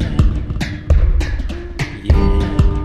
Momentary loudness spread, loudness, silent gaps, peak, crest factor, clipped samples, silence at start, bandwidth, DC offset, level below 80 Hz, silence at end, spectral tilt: 9 LU; -18 LUFS; none; 0 dBFS; 14 dB; under 0.1%; 0 s; 9.8 kHz; under 0.1%; -16 dBFS; 0 s; -7.5 dB/octave